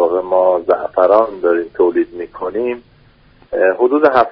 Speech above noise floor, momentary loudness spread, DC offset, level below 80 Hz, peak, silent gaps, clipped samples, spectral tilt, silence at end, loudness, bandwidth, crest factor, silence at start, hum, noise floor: 34 dB; 11 LU; under 0.1%; -52 dBFS; 0 dBFS; none; under 0.1%; -4 dB/octave; 0 s; -15 LUFS; 5.6 kHz; 14 dB; 0 s; none; -48 dBFS